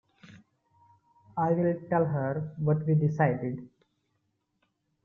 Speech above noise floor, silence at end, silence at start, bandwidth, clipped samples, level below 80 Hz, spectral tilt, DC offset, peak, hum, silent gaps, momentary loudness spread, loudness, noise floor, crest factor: 50 dB; 1.35 s; 0.25 s; 2.9 kHz; under 0.1%; -68 dBFS; -11 dB/octave; under 0.1%; -12 dBFS; none; none; 10 LU; -28 LUFS; -77 dBFS; 18 dB